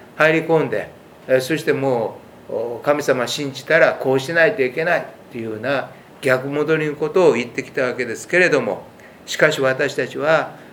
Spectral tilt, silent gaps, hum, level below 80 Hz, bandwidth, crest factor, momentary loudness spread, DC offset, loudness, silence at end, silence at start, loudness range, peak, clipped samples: -5 dB/octave; none; none; -64 dBFS; 18.5 kHz; 20 dB; 13 LU; under 0.1%; -19 LUFS; 0 s; 0 s; 2 LU; 0 dBFS; under 0.1%